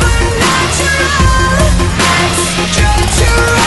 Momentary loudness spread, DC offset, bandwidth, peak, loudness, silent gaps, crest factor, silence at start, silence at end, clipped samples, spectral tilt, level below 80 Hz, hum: 2 LU; under 0.1%; 12 kHz; 0 dBFS; -10 LUFS; none; 10 dB; 0 s; 0 s; under 0.1%; -3.5 dB/octave; -16 dBFS; none